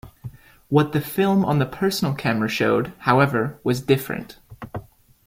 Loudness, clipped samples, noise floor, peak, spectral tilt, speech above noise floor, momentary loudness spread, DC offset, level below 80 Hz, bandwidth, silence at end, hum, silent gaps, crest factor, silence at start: -21 LUFS; under 0.1%; -40 dBFS; -4 dBFS; -6.5 dB/octave; 19 dB; 20 LU; under 0.1%; -52 dBFS; 16.5 kHz; 0.45 s; none; none; 18 dB; 0.05 s